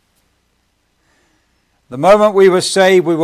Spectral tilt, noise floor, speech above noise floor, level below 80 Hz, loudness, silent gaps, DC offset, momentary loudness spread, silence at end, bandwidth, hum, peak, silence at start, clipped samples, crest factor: -4.5 dB/octave; -62 dBFS; 52 dB; -52 dBFS; -10 LUFS; none; under 0.1%; 6 LU; 0 s; 15 kHz; none; 0 dBFS; 1.9 s; under 0.1%; 14 dB